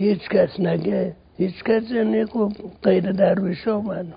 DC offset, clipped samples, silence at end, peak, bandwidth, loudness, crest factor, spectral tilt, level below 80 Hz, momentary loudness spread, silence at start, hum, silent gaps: under 0.1%; under 0.1%; 0 s; -4 dBFS; 5.2 kHz; -22 LUFS; 16 dB; -12 dB/octave; -54 dBFS; 6 LU; 0 s; none; none